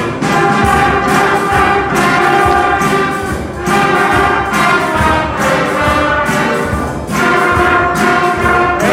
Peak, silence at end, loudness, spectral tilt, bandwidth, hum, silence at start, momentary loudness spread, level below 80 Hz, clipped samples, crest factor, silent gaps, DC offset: 0 dBFS; 0 s; -11 LUFS; -5 dB/octave; 16.5 kHz; none; 0 s; 4 LU; -30 dBFS; under 0.1%; 12 dB; none; under 0.1%